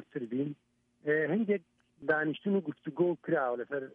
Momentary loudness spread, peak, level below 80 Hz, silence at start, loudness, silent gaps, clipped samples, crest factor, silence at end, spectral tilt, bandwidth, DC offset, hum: 10 LU; -16 dBFS; -80 dBFS; 0 s; -33 LUFS; none; under 0.1%; 18 dB; 0.05 s; -9.5 dB/octave; 4.1 kHz; under 0.1%; none